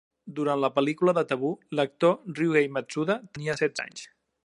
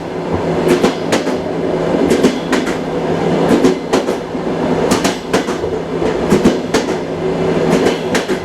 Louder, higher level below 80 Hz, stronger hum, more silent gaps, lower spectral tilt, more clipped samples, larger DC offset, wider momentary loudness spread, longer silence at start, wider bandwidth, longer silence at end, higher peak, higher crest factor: second, -27 LUFS vs -15 LUFS; second, -72 dBFS vs -40 dBFS; neither; neither; about the same, -6 dB/octave vs -5.5 dB/octave; neither; neither; first, 9 LU vs 6 LU; first, 0.25 s vs 0 s; second, 11 kHz vs 15 kHz; first, 0.4 s vs 0 s; second, -8 dBFS vs 0 dBFS; about the same, 18 dB vs 14 dB